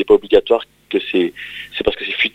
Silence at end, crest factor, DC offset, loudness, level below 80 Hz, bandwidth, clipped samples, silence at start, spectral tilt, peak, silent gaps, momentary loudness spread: 0.05 s; 16 dB; under 0.1%; -17 LUFS; -44 dBFS; 8.2 kHz; under 0.1%; 0 s; -5.5 dB/octave; 0 dBFS; none; 10 LU